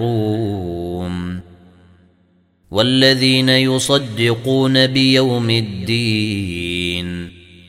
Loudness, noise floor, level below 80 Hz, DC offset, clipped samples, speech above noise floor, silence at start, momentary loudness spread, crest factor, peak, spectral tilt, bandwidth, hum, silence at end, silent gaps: -16 LUFS; -57 dBFS; -46 dBFS; under 0.1%; under 0.1%; 42 dB; 0 s; 12 LU; 18 dB; 0 dBFS; -5 dB/octave; 16 kHz; none; 0.3 s; none